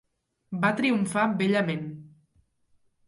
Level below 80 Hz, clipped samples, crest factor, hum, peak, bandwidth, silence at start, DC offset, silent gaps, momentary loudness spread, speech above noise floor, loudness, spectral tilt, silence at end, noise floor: -70 dBFS; under 0.1%; 18 dB; none; -10 dBFS; 11.5 kHz; 0.5 s; under 0.1%; none; 15 LU; 42 dB; -26 LUFS; -6 dB/octave; 1 s; -67 dBFS